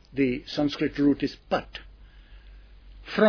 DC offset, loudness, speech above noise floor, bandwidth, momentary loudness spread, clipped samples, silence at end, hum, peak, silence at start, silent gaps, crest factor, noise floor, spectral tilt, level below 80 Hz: under 0.1%; -27 LUFS; 23 dB; 5.4 kHz; 19 LU; under 0.1%; 0 s; none; -8 dBFS; 0.15 s; none; 20 dB; -49 dBFS; -6.5 dB/octave; -48 dBFS